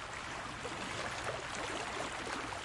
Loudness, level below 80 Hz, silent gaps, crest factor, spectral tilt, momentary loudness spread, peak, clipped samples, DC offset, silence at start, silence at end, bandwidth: -40 LUFS; -60 dBFS; none; 18 dB; -3 dB/octave; 3 LU; -22 dBFS; under 0.1%; under 0.1%; 0 s; 0 s; 11.5 kHz